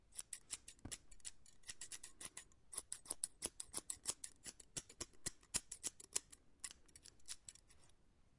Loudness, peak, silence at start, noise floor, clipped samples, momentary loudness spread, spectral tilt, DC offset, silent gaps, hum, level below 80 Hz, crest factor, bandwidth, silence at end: -49 LUFS; -18 dBFS; 0 s; -70 dBFS; under 0.1%; 12 LU; -0.5 dB/octave; under 0.1%; none; none; -72 dBFS; 34 dB; 12 kHz; 0 s